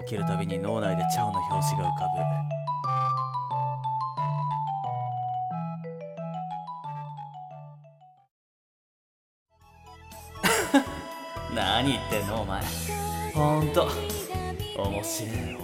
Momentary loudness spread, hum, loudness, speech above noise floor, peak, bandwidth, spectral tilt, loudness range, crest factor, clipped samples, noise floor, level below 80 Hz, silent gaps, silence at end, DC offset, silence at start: 13 LU; none; -29 LUFS; 27 dB; -8 dBFS; 17.5 kHz; -5 dB/octave; 13 LU; 22 dB; under 0.1%; -54 dBFS; -48 dBFS; 8.31-9.46 s; 0 s; under 0.1%; 0 s